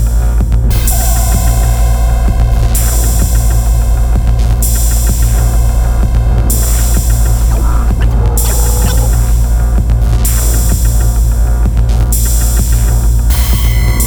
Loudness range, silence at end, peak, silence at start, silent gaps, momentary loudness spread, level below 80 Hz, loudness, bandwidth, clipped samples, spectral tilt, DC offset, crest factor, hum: 0 LU; 0 s; 0 dBFS; 0 s; none; 1 LU; -10 dBFS; -12 LUFS; over 20 kHz; under 0.1%; -5 dB/octave; under 0.1%; 8 dB; none